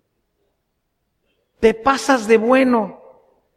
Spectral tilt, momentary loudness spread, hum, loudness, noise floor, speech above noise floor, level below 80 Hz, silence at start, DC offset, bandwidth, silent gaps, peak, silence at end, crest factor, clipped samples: -4.5 dB/octave; 6 LU; none; -16 LUFS; -72 dBFS; 56 dB; -50 dBFS; 1.6 s; under 0.1%; 14 kHz; none; -2 dBFS; 0.6 s; 18 dB; under 0.1%